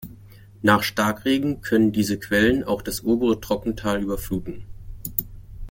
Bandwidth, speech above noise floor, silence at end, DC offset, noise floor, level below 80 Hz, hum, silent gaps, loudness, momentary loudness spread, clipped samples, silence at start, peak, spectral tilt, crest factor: 17 kHz; 24 dB; 0 s; under 0.1%; -46 dBFS; -42 dBFS; none; none; -22 LUFS; 17 LU; under 0.1%; 0 s; -2 dBFS; -5 dB/octave; 22 dB